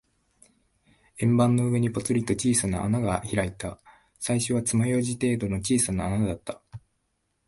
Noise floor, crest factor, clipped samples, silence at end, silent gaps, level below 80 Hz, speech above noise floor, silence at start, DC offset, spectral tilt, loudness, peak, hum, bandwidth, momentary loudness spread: -75 dBFS; 18 dB; under 0.1%; 0.7 s; none; -48 dBFS; 50 dB; 1.15 s; under 0.1%; -5.5 dB/octave; -25 LUFS; -8 dBFS; none; 12 kHz; 11 LU